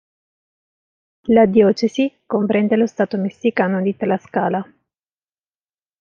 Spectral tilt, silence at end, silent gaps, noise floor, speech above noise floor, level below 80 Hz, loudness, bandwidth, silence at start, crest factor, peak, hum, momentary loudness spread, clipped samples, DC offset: -7.5 dB/octave; 1.4 s; none; under -90 dBFS; over 73 dB; -60 dBFS; -18 LUFS; 7.2 kHz; 1.25 s; 18 dB; -2 dBFS; none; 9 LU; under 0.1%; under 0.1%